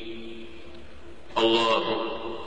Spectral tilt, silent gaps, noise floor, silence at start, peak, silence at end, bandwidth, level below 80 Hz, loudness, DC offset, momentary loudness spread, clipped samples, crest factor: -4 dB/octave; none; -47 dBFS; 0 s; -12 dBFS; 0 s; 9.4 kHz; -54 dBFS; -25 LUFS; 1%; 24 LU; under 0.1%; 16 dB